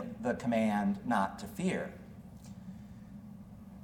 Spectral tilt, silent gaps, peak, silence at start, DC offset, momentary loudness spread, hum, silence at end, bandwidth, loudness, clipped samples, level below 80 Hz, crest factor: -6.5 dB/octave; none; -18 dBFS; 0 s; under 0.1%; 20 LU; none; 0 s; 17.5 kHz; -34 LUFS; under 0.1%; -60 dBFS; 18 dB